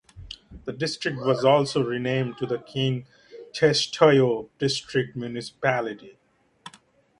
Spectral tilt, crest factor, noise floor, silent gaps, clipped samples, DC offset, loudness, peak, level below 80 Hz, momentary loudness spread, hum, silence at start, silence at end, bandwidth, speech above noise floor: -5 dB/octave; 22 dB; -57 dBFS; none; under 0.1%; under 0.1%; -24 LUFS; -2 dBFS; -58 dBFS; 18 LU; none; 0.15 s; 0.5 s; 11.5 kHz; 33 dB